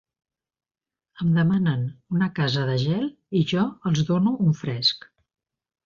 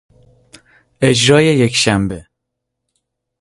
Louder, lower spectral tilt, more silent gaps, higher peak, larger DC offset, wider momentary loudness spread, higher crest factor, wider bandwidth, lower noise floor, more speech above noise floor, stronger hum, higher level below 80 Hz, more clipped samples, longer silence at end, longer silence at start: second, -23 LUFS vs -13 LUFS; first, -6.5 dB/octave vs -4.5 dB/octave; neither; second, -10 dBFS vs 0 dBFS; neither; second, 7 LU vs 11 LU; about the same, 14 dB vs 16 dB; second, 7.2 kHz vs 11.5 kHz; first, under -90 dBFS vs -77 dBFS; first, over 68 dB vs 64 dB; neither; second, -58 dBFS vs -44 dBFS; neither; second, 0.9 s vs 1.2 s; first, 1.2 s vs 1 s